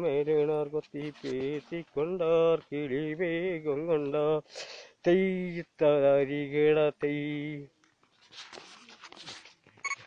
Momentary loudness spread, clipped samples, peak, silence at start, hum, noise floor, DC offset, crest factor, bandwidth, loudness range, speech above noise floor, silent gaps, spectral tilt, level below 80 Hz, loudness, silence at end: 20 LU; under 0.1%; -14 dBFS; 0 s; none; -65 dBFS; under 0.1%; 16 dB; 9.2 kHz; 5 LU; 36 dB; none; -6.5 dB/octave; -68 dBFS; -29 LUFS; 0 s